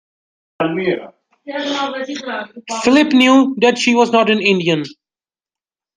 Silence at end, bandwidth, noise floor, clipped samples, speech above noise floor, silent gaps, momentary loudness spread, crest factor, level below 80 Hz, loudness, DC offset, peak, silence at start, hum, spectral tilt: 1.05 s; 9.8 kHz; under -90 dBFS; under 0.1%; over 75 dB; none; 15 LU; 16 dB; -60 dBFS; -15 LUFS; under 0.1%; -2 dBFS; 0.6 s; none; -4.5 dB/octave